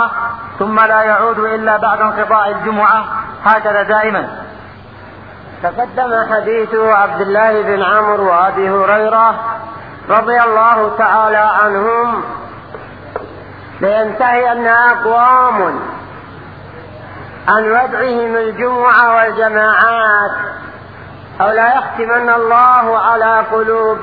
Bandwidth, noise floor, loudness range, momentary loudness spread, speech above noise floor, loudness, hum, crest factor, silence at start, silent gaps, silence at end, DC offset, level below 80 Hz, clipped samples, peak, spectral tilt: 5.4 kHz; -34 dBFS; 4 LU; 21 LU; 22 dB; -11 LUFS; none; 12 dB; 0 s; none; 0 s; 0.3%; -50 dBFS; under 0.1%; 0 dBFS; -8 dB/octave